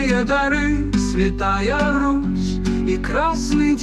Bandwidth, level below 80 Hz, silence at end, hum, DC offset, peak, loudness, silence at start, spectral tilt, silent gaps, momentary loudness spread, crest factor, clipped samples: 11.5 kHz; -28 dBFS; 0 s; none; under 0.1%; -6 dBFS; -19 LUFS; 0 s; -5.5 dB/octave; none; 3 LU; 12 dB; under 0.1%